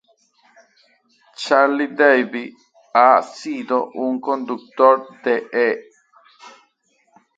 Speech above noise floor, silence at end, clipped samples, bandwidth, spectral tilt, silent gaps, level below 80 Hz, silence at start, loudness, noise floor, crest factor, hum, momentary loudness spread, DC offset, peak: 46 dB; 0.9 s; under 0.1%; 9 kHz; -4 dB/octave; none; -74 dBFS; 1.4 s; -18 LUFS; -63 dBFS; 20 dB; none; 14 LU; under 0.1%; 0 dBFS